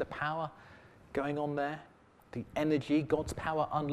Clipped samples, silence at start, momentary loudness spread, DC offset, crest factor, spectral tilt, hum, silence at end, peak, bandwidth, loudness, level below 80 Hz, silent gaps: under 0.1%; 0 s; 13 LU; under 0.1%; 18 dB; -6.5 dB/octave; none; 0 s; -16 dBFS; 13 kHz; -34 LUFS; -58 dBFS; none